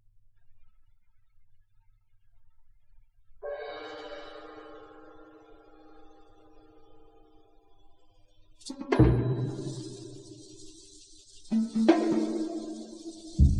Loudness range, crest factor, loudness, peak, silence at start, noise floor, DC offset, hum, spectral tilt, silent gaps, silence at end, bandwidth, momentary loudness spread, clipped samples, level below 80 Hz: 19 LU; 26 dB; -29 LUFS; -6 dBFS; 0.5 s; -61 dBFS; under 0.1%; none; -7.5 dB/octave; none; 0 s; 10.5 kHz; 27 LU; under 0.1%; -40 dBFS